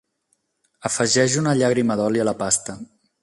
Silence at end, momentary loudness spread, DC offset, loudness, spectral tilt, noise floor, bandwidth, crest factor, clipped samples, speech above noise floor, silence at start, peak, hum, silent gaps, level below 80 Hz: 0.4 s; 12 LU; under 0.1%; -20 LUFS; -4 dB/octave; -70 dBFS; 11.5 kHz; 18 dB; under 0.1%; 50 dB; 0.85 s; -4 dBFS; none; none; -58 dBFS